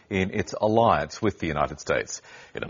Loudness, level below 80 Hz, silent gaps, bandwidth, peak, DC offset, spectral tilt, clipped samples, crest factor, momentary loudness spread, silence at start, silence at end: -25 LUFS; -48 dBFS; none; 7.4 kHz; -6 dBFS; under 0.1%; -4.5 dB/octave; under 0.1%; 18 dB; 13 LU; 0.1 s; 0 s